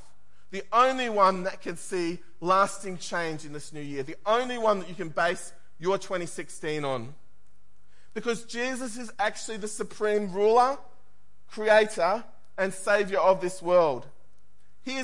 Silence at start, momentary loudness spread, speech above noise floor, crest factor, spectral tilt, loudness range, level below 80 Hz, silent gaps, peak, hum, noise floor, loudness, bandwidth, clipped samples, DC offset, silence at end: 0.5 s; 15 LU; 40 dB; 20 dB; -4 dB/octave; 8 LU; -68 dBFS; none; -8 dBFS; none; -67 dBFS; -27 LUFS; 11.5 kHz; under 0.1%; 1%; 0 s